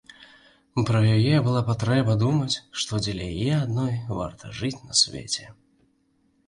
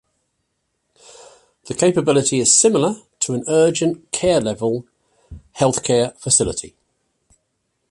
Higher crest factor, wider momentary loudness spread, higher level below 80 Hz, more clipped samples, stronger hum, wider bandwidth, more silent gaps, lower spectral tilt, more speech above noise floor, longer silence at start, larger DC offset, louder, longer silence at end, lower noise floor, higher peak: about the same, 18 dB vs 18 dB; about the same, 11 LU vs 11 LU; about the same, -50 dBFS vs -50 dBFS; neither; neither; about the same, 11 kHz vs 11.5 kHz; neither; first, -5 dB/octave vs -3.5 dB/octave; second, 43 dB vs 55 dB; second, 0.2 s vs 1.65 s; neither; second, -24 LUFS vs -17 LUFS; second, 0.95 s vs 1.25 s; second, -66 dBFS vs -72 dBFS; second, -8 dBFS vs -2 dBFS